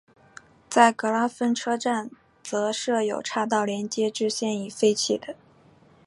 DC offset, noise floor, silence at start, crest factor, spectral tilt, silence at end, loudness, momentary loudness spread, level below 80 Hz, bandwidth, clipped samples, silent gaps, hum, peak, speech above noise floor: under 0.1%; -56 dBFS; 0.7 s; 24 dB; -3.5 dB/octave; 0.7 s; -25 LUFS; 11 LU; -72 dBFS; 11.5 kHz; under 0.1%; none; none; -2 dBFS; 32 dB